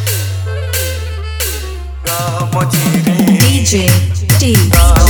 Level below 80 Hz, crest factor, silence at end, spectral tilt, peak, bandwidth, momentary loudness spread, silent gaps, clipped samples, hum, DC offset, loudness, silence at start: -18 dBFS; 12 dB; 0 s; -4.5 dB/octave; 0 dBFS; over 20 kHz; 11 LU; none; 0.2%; none; under 0.1%; -12 LUFS; 0 s